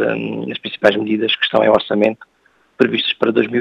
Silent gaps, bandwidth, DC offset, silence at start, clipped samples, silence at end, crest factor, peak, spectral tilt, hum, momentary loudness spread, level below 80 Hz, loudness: none; 8.2 kHz; under 0.1%; 0 s; under 0.1%; 0 s; 16 dB; 0 dBFS; -6.5 dB/octave; none; 10 LU; -60 dBFS; -16 LUFS